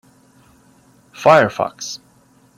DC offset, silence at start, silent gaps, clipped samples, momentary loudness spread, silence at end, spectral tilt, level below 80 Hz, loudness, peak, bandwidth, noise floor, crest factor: under 0.1%; 1.2 s; none; under 0.1%; 17 LU; 0.6 s; -4.5 dB/octave; -62 dBFS; -16 LUFS; 0 dBFS; 15.5 kHz; -53 dBFS; 20 dB